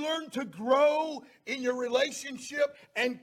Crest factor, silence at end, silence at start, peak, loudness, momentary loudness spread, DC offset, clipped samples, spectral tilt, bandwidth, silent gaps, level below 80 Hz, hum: 18 dB; 0.05 s; 0 s; -12 dBFS; -30 LUFS; 13 LU; under 0.1%; under 0.1%; -2.5 dB/octave; 15.5 kHz; none; -78 dBFS; none